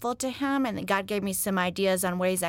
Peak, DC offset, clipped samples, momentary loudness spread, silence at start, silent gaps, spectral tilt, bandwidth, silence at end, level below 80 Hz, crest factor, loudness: -12 dBFS; under 0.1%; under 0.1%; 3 LU; 0 s; none; -4 dB/octave; 17 kHz; 0 s; -60 dBFS; 16 dB; -27 LUFS